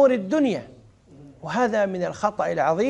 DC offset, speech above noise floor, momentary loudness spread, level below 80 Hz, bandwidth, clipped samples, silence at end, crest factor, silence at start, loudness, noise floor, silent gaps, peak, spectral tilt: under 0.1%; 26 dB; 8 LU; -60 dBFS; 10.5 kHz; under 0.1%; 0 s; 16 dB; 0 s; -23 LUFS; -49 dBFS; none; -8 dBFS; -6 dB/octave